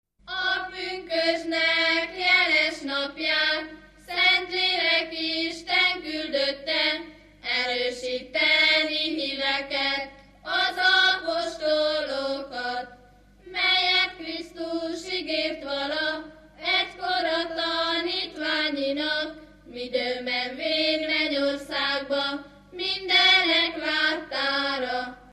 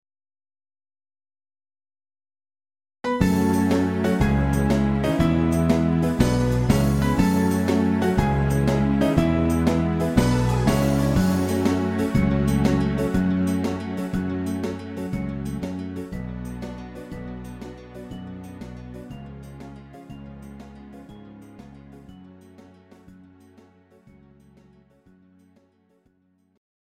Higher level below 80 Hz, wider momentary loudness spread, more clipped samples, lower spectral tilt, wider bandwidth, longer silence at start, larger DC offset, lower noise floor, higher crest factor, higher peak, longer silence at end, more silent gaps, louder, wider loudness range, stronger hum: second, -58 dBFS vs -36 dBFS; second, 12 LU vs 20 LU; neither; second, -2 dB/octave vs -7 dB/octave; second, 14.5 kHz vs 16.5 kHz; second, 0.25 s vs 3.05 s; neither; second, -54 dBFS vs -65 dBFS; about the same, 18 dB vs 20 dB; second, -8 dBFS vs -2 dBFS; second, 0 s vs 3.9 s; neither; about the same, -24 LUFS vs -22 LUFS; second, 4 LU vs 19 LU; first, 50 Hz at -60 dBFS vs none